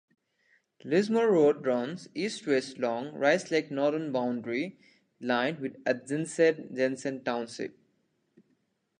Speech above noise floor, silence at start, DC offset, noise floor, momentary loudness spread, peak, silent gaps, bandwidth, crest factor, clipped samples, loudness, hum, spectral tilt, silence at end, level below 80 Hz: 45 dB; 0.85 s; under 0.1%; -74 dBFS; 10 LU; -10 dBFS; none; 10 kHz; 20 dB; under 0.1%; -29 LUFS; none; -5 dB/octave; 1.3 s; -82 dBFS